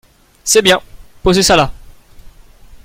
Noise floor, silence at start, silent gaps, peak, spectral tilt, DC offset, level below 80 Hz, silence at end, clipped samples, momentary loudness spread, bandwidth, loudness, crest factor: -39 dBFS; 0.45 s; none; 0 dBFS; -3 dB/octave; under 0.1%; -34 dBFS; 0.1 s; under 0.1%; 10 LU; 16.5 kHz; -12 LUFS; 16 dB